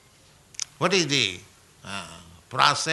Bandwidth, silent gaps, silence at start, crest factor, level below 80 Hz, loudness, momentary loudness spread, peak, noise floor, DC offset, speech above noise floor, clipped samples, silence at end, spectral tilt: 12 kHz; none; 0.6 s; 24 dB; -62 dBFS; -23 LUFS; 20 LU; -2 dBFS; -56 dBFS; under 0.1%; 32 dB; under 0.1%; 0 s; -2.5 dB/octave